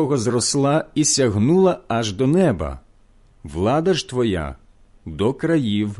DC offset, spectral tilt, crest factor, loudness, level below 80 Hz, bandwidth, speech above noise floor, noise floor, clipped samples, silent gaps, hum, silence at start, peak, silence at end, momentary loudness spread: under 0.1%; -5 dB/octave; 14 dB; -19 LUFS; -40 dBFS; 11.5 kHz; 33 dB; -52 dBFS; under 0.1%; none; none; 0 s; -4 dBFS; 0 s; 11 LU